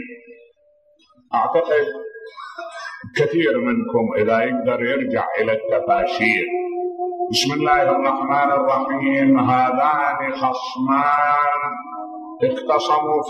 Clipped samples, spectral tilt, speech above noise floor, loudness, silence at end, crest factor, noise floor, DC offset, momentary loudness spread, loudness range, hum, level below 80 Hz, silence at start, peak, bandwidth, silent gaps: under 0.1%; -5 dB/octave; 39 dB; -19 LUFS; 0 s; 18 dB; -58 dBFS; under 0.1%; 15 LU; 4 LU; none; -58 dBFS; 0 s; -2 dBFS; 13.5 kHz; none